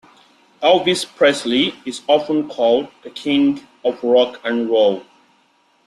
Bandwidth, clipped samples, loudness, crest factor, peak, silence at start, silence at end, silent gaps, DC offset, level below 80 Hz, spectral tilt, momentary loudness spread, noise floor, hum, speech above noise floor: 12.5 kHz; under 0.1%; -17 LUFS; 16 dB; -2 dBFS; 0.6 s; 0.85 s; none; under 0.1%; -62 dBFS; -4 dB/octave; 8 LU; -59 dBFS; none; 42 dB